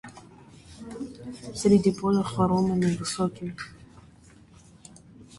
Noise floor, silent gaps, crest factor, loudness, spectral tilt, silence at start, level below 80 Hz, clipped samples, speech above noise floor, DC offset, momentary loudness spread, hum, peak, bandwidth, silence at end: -53 dBFS; none; 20 dB; -25 LUFS; -6.5 dB/octave; 0.05 s; -54 dBFS; under 0.1%; 28 dB; under 0.1%; 20 LU; none; -8 dBFS; 11.5 kHz; 0 s